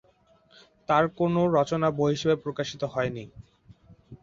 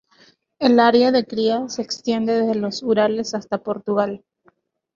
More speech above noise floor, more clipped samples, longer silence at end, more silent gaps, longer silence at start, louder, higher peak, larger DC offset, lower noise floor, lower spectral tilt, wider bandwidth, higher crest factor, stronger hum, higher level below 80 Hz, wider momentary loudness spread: second, 36 dB vs 41 dB; neither; second, 0.1 s vs 0.8 s; neither; first, 0.9 s vs 0.6 s; second, -26 LUFS vs -20 LUFS; second, -8 dBFS vs -2 dBFS; neither; about the same, -62 dBFS vs -60 dBFS; first, -6.5 dB/octave vs -5 dB/octave; about the same, 7.6 kHz vs 7.4 kHz; about the same, 18 dB vs 18 dB; neither; first, -58 dBFS vs -64 dBFS; about the same, 12 LU vs 11 LU